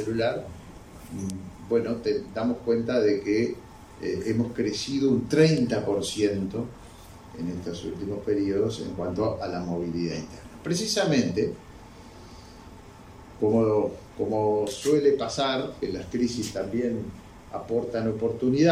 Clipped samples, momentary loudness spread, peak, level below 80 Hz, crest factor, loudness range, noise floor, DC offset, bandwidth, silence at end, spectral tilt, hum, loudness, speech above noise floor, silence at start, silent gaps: under 0.1%; 23 LU; -6 dBFS; -54 dBFS; 20 dB; 4 LU; -46 dBFS; under 0.1%; 15.5 kHz; 0 s; -5.5 dB/octave; none; -27 LUFS; 21 dB; 0 s; none